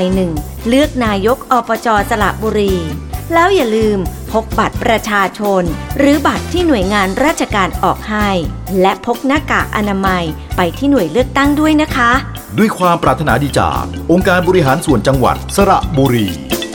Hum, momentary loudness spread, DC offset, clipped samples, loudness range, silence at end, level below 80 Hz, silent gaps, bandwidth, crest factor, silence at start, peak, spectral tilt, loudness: none; 6 LU; 0.1%; under 0.1%; 2 LU; 0 s; -28 dBFS; none; 19 kHz; 12 dB; 0 s; 0 dBFS; -5.5 dB/octave; -13 LUFS